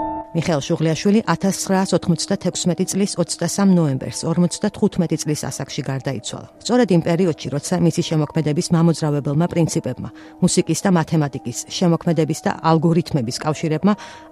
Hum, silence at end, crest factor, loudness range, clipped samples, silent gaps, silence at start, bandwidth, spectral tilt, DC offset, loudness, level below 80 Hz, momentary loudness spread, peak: none; 0.05 s; 18 dB; 2 LU; under 0.1%; none; 0 s; 13.5 kHz; -5.5 dB/octave; under 0.1%; -19 LUFS; -52 dBFS; 8 LU; -2 dBFS